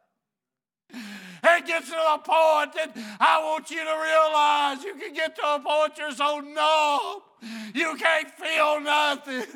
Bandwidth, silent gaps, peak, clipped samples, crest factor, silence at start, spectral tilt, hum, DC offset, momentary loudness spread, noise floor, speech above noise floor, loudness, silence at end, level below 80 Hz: 18 kHz; none; -6 dBFS; under 0.1%; 18 dB; 0.95 s; -1.5 dB/octave; none; under 0.1%; 13 LU; under -90 dBFS; over 66 dB; -23 LUFS; 0.05 s; under -90 dBFS